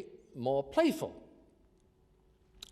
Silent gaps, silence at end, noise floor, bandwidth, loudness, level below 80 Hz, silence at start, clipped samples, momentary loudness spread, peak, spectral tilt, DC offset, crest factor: none; 1.5 s; -67 dBFS; 15 kHz; -33 LUFS; -66 dBFS; 0 s; under 0.1%; 22 LU; -16 dBFS; -5.5 dB/octave; under 0.1%; 20 dB